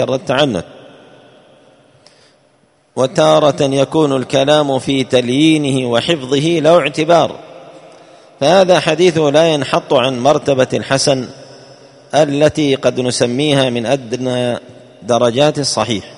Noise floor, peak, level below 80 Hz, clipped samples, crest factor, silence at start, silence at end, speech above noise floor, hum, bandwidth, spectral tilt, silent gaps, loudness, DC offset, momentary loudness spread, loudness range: -54 dBFS; 0 dBFS; -52 dBFS; under 0.1%; 14 dB; 0 s; 0 s; 41 dB; none; 11 kHz; -5 dB/octave; none; -13 LUFS; under 0.1%; 7 LU; 3 LU